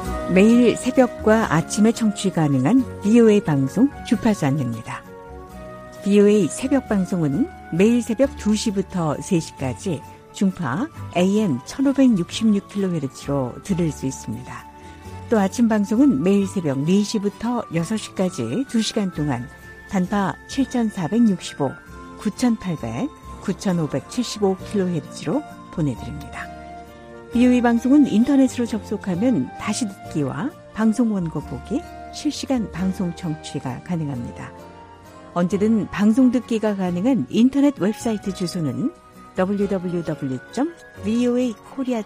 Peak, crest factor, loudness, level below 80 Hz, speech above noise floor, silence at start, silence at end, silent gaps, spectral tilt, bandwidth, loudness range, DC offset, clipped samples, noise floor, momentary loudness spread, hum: -2 dBFS; 18 dB; -21 LUFS; -46 dBFS; 22 dB; 0 s; 0 s; none; -6.5 dB/octave; 15 kHz; 6 LU; under 0.1%; under 0.1%; -42 dBFS; 15 LU; none